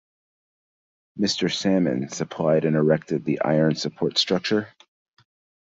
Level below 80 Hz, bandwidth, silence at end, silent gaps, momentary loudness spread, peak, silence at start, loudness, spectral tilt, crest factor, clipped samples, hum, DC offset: -64 dBFS; 7.8 kHz; 1 s; none; 6 LU; -6 dBFS; 1.15 s; -23 LUFS; -5 dB/octave; 18 dB; under 0.1%; none; under 0.1%